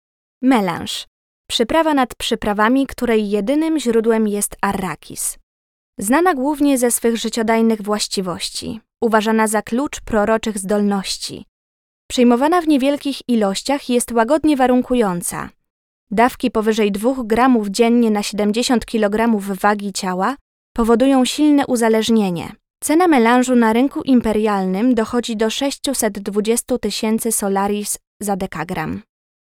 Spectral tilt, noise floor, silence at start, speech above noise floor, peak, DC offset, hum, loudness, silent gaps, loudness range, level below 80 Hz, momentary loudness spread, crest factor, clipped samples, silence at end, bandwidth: -4 dB/octave; under -90 dBFS; 0.4 s; over 73 dB; -2 dBFS; under 0.1%; none; -17 LUFS; 1.07-1.44 s, 5.43-5.93 s, 11.48-12.09 s, 15.70-16.07 s, 20.41-20.75 s, 28.07-28.20 s; 3 LU; -46 dBFS; 10 LU; 14 dB; under 0.1%; 0.4 s; 17 kHz